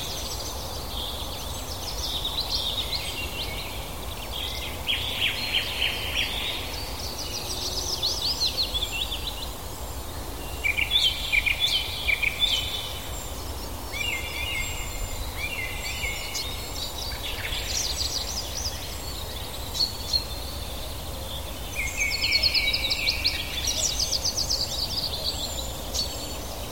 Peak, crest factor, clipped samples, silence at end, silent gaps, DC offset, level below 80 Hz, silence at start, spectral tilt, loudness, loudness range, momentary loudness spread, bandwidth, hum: -10 dBFS; 20 dB; under 0.1%; 0 s; none; 0.8%; -38 dBFS; 0 s; -1.5 dB/octave; -27 LUFS; 6 LU; 12 LU; 17 kHz; none